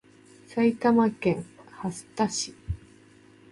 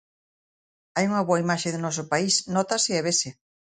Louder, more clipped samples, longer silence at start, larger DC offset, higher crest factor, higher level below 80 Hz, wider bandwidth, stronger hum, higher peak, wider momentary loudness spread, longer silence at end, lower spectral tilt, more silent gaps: second, -27 LUFS vs -24 LUFS; neither; second, 0.5 s vs 0.95 s; neither; about the same, 18 dB vs 18 dB; first, -50 dBFS vs -68 dBFS; first, 11.5 kHz vs 9.6 kHz; neither; about the same, -10 dBFS vs -8 dBFS; first, 16 LU vs 6 LU; first, 0.75 s vs 0.3 s; first, -5 dB/octave vs -3.5 dB/octave; neither